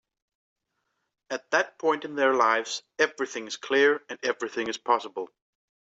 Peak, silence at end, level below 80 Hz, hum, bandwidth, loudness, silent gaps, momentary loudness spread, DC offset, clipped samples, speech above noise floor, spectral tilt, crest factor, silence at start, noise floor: -8 dBFS; 0.55 s; -78 dBFS; none; 8 kHz; -26 LUFS; none; 14 LU; under 0.1%; under 0.1%; 52 dB; -2 dB/octave; 20 dB; 1.3 s; -79 dBFS